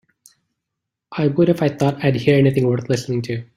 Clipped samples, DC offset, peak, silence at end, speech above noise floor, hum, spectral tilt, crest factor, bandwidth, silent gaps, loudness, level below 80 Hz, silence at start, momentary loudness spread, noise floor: under 0.1%; under 0.1%; -2 dBFS; 0.15 s; 64 dB; none; -7.5 dB/octave; 16 dB; 14 kHz; none; -18 LUFS; -54 dBFS; 1.1 s; 8 LU; -81 dBFS